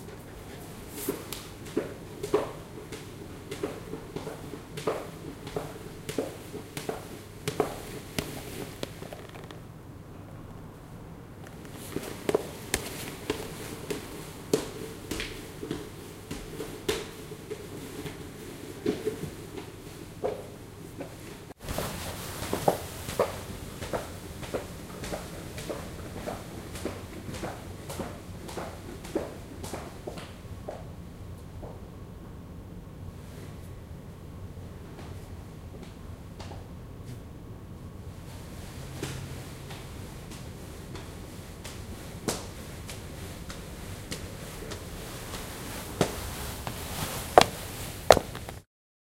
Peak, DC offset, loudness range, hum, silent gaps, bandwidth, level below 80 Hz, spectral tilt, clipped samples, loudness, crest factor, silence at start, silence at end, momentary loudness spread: 0 dBFS; under 0.1%; 10 LU; none; none; 16 kHz; -48 dBFS; -4.5 dB/octave; under 0.1%; -35 LUFS; 36 dB; 0 s; 0.45 s; 13 LU